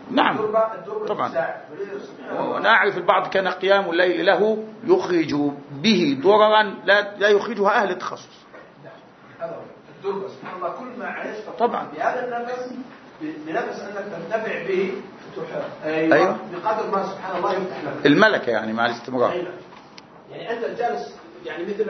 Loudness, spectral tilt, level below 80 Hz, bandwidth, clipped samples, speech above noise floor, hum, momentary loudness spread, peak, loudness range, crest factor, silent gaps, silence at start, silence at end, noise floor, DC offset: -21 LUFS; -5.5 dB/octave; -70 dBFS; 6.4 kHz; under 0.1%; 24 dB; none; 16 LU; 0 dBFS; 9 LU; 22 dB; none; 0 s; 0 s; -45 dBFS; under 0.1%